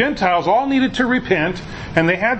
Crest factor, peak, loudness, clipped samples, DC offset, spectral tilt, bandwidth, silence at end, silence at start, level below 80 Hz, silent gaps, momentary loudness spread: 18 dB; 0 dBFS; -17 LUFS; under 0.1%; under 0.1%; -6 dB/octave; 8.4 kHz; 0 s; 0 s; -42 dBFS; none; 6 LU